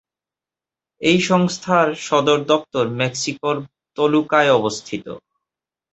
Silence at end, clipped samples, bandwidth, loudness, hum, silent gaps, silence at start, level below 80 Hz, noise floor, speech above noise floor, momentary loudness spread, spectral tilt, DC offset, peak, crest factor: 0.75 s; under 0.1%; 8.2 kHz; -18 LUFS; none; none; 1 s; -60 dBFS; -89 dBFS; 71 dB; 14 LU; -4.5 dB/octave; under 0.1%; -2 dBFS; 18 dB